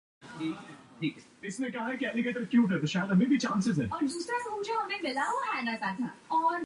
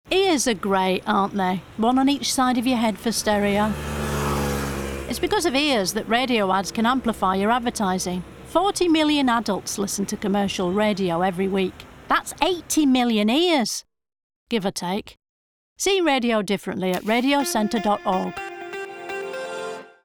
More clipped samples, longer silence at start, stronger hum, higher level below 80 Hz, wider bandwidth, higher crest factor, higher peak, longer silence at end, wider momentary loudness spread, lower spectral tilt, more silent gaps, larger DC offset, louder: neither; first, 0.2 s vs 0.05 s; neither; second, -66 dBFS vs -44 dBFS; second, 11.5 kHz vs over 20 kHz; about the same, 16 dB vs 16 dB; second, -16 dBFS vs -6 dBFS; second, 0 s vs 0.15 s; about the same, 11 LU vs 10 LU; first, -5.5 dB/octave vs -4 dB/octave; second, none vs 14.23-14.30 s, 14.36-14.46 s, 15.29-15.76 s; neither; second, -31 LUFS vs -22 LUFS